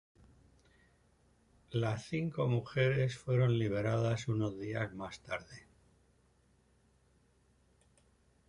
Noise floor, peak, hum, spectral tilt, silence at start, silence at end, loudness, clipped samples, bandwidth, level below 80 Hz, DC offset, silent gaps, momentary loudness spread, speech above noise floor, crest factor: -70 dBFS; -18 dBFS; none; -7 dB/octave; 1.7 s; 2.9 s; -35 LUFS; under 0.1%; 10.5 kHz; -64 dBFS; under 0.1%; none; 12 LU; 36 dB; 18 dB